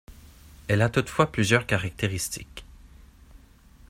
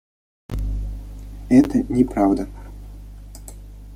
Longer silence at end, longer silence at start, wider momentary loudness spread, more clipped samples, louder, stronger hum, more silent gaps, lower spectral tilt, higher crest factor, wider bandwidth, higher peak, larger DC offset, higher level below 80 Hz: first, 0.5 s vs 0 s; second, 0.1 s vs 0.5 s; second, 18 LU vs 24 LU; neither; second, -25 LUFS vs -20 LUFS; second, none vs 50 Hz at -35 dBFS; neither; second, -5 dB/octave vs -8 dB/octave; about the same, 24 dB vs 20 dB; about the same, 16 kHz vs 15 kHz; about the same, -4 dBFS vs -2 dBFS; neither; second, -48 dBFS vs -32 dBFS